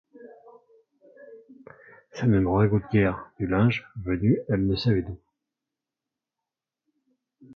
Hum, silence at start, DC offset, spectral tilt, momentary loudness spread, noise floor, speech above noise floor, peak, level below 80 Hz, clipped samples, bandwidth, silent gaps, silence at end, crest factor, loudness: none; 0.15 s; under 0.1%; -9 dB/octave; 10 LU; -88 dBFS; 65 dB; -10 dBFS; -46 dBFS; under 0.1%; 6.6 kHz; none; 0 s; 18 dB; -24 LUFS